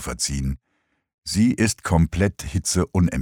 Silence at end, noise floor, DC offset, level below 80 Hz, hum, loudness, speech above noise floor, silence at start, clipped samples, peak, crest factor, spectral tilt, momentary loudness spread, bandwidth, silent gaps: 0 s; -71 dBFS; under 0.1%; -34 dBFS; none; -22 LUFS; 50 dB; 0 s; under 0.1%; -4 dBFS; 18 dB; -5 dB/octave; 9 LU; 18.5 kHz; 1.14-1.22 s